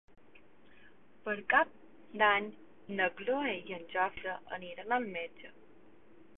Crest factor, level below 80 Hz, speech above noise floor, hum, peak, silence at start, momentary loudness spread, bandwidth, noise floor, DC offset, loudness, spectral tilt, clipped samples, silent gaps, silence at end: 22 dB; -72 dBFS; 29 dB; none; -14 dBFS; 1.25 s; 17 LU; 3.9 kHz; -63 dBFS; 0.2%; -33 LUFS; 2 dB/octave; under 0.1%; none; 0.9 s